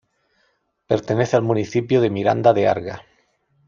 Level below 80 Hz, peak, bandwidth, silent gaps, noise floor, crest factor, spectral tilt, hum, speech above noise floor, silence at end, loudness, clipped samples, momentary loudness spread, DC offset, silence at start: -60 dBFS; -2 dBFS; 7.4 kHz; none; -67 dBFS; 18 dB; -7 dB/octave; none; 48 dB; 0.65 s; -19 LUFS; under 0.1%; 9 LU; under 0.1%; 0.9 s